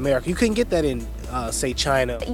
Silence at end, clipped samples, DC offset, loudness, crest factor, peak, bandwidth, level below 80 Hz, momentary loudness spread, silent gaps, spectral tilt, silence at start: 0 s; under 0.1%; under 0.1%; -23 LUFS; 16 dB; -6 dBFS; 18 kHz; -34 dBFS; 8 LU; none; -4.5 dB/octave; 0 s